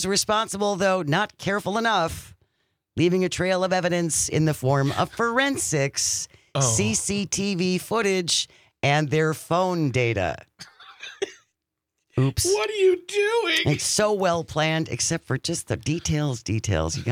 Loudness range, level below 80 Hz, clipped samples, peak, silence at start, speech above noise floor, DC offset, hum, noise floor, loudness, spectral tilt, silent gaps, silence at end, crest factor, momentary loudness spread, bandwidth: 3 LU; -52 dBFS; under 0.1%; -6 dBFS; 0 s; 58 dB; under 0.1%; none; -81 dBFS; -23 LUFS; -4 dB/octave; none; 0 s; 18 dB; 7 LU; 16.5 kHz